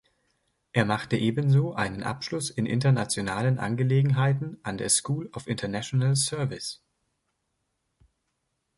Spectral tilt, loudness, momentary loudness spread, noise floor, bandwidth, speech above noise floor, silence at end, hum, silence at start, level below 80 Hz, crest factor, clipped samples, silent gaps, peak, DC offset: -5 dB/octave; -26 LUFS; 9 LU; -78 dBFS; 11.5 kHz; 52 dB; 2.05 s; none; 0.75 s; -58 dBFS; 20 dB; under 0.1%; none; -6 dBFS; under 0.1%